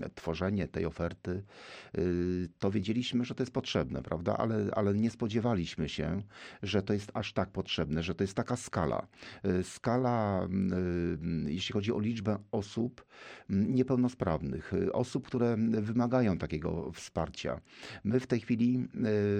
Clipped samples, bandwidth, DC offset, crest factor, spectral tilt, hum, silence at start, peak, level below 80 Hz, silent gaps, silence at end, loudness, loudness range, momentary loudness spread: under 0.1%; 10 kHz; under 0.1%; 16 dB; -6.5 dB/octave; none; 0 s; -16 dBFS; -54 dBFS; none; 0 s; -33 LUFS; 2 LU; 9 LU